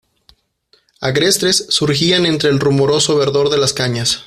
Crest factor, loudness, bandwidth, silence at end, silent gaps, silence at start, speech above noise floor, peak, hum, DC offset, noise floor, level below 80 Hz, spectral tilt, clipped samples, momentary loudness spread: 14 dB; -14 LUFS; 15.5 kHz; 0.05 s; none; 1 s; 43 dB; 0 dBFS; none; under 0.1%; -57 dBFS; -50 dBFS; -3.5 dB/octave; under 0.1%; 3 LU